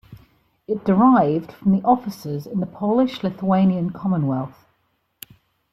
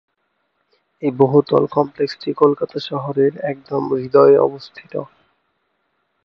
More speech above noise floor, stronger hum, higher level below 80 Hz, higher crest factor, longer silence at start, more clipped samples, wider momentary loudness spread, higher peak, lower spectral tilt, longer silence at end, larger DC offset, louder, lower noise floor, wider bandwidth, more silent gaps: second, 49 dB vs 53 dB; neither; first, -58 dBFS vs -64 dBFS; about the same, 16 dB vs 18 dB; second, 0.1 s vs 1 s; neither; second, 12 LU vs 16 LU; second, -4 dBFS vs 0 dBFS; about the same, -8.5 dB/octave vs -8.5 dB/octave; about the same, 1.2 s vs 1.2 s; neither; second, -20 LUFS vs -17 LUFS; about the same, -68 dBFS vs -69 dBFS; first, 14 kHz vs 6.2 kHz; neither